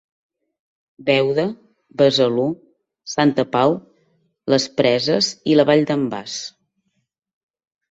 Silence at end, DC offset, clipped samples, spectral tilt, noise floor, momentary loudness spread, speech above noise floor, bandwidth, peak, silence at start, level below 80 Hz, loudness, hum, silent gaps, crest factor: 1.45 s; under 0.1%; under 0.1%; -5 dB/octave; -72 dBFS; 14 LU; 54 dB; 8 kHz; -2 dBFS; 1 s; -62 dBFS; -18 LUFS; none; none; 18 dB